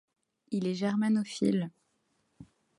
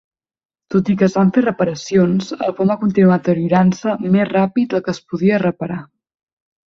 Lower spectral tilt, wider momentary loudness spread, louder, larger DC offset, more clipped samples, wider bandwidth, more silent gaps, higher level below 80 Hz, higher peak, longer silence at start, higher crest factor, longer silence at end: about the same, -6.5 dB/octave vs -7.5 dB/octave; about the same, 7 LU vs 8 LU; second, -31 LUFS vs -16 LUFS; neither; neither; first, 11.5 kHz vs 7.2 kHz; neither; second, -74 dBFS vs -54 dBFS; second, -14 dBFS vs -2 dBFS; second, 0.5 s vs 0.7 s; about the same, 18 dB vs 14 dB; second, 0.35 s vs 0.9 s